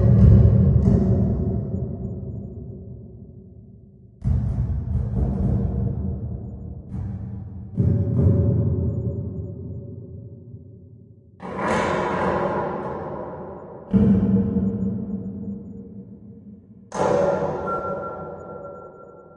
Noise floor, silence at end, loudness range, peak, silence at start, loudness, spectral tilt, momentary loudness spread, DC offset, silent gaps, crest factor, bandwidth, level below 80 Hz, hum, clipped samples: -47 dBFS; 0.15 s; 6 LU; -2 dBFS; 0 s; -22 LUFS; -9.5 dB/octave; 22 LU; under 0.1%; none; 20 dB; 9 kHz; -32 dBFS; none; under 0.1%